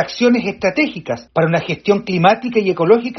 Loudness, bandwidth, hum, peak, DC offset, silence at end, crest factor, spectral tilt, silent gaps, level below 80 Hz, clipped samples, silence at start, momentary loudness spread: -16 LUFS; 6.4 kHz; none; 0 dBFS; under 0.1%; 0 s; 16 dB; -4.5 dB/octave; none; -54 dBFS; under 0.1%; 0 s; 5 LU